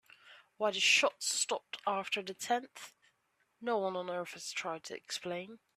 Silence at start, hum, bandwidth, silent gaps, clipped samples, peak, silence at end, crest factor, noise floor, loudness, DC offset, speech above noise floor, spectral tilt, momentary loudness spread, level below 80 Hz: 0.25 s; none; 15 kHz; none; under 0.1%; -16 dBFS; 0.2 s; 22 dB; -77 dBFS; -34 LUFS; under 0.1%; 42 dB; -1 dB/octave; 16 LU; -86 dBFS